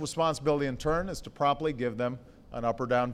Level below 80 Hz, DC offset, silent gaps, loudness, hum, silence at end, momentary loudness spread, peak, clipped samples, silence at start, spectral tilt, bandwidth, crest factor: -48 dBFS; under 0.1%; none; -30 LUFS; none; 0 s; 8 LU; -14 dBFS; under 0.1%; 0 s; -5.5 dB/octave; 15 kHz; 16 dB